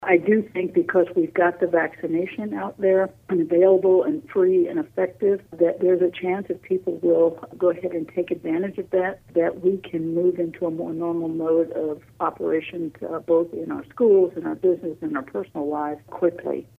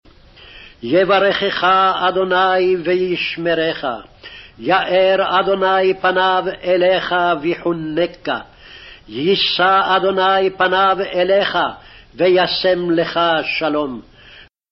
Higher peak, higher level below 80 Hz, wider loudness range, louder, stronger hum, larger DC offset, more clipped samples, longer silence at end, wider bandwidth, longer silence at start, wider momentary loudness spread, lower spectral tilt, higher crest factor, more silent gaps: about the same, -4 dBFS vs -4 dBFS; second, -64 dBFS vs -50 dBFS; about the same, 4 LU vs 2 LU; second, -23 LUFS vs -16 LUFS; neither; neither; neither; second, 0.15 s vs 0.3 s; second, 3.7 kHz vs 6 kHz; second, 0 s vs 0.45 s; about the same, 10 LU vs 10 LU; first, -9 dB/octave vs -2 dB/octave; about the same, 18 dB vs 14 dB; neither